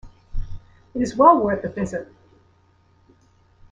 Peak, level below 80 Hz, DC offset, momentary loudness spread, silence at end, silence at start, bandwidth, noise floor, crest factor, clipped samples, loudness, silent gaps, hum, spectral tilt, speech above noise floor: -2 dBFS; -38 dBFS; under 0.1%; 24 LU; 1.7 s; 0.05 s; 9.8 kHz; -58 dBFS; 22 dB; under 0.1%; -19 LUFS; none; none; -7 dB/octave; 40 dB